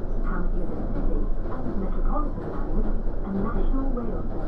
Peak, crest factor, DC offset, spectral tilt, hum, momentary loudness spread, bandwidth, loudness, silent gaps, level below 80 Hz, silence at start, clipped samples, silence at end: -12 dBFS; 12 dB; under 0.1%; -10.5 dB/octave; none; 3 LU; 2.2 kHz; -30 LUFS; none; -24 dBFS; 0 s; under 0.1%; 0 s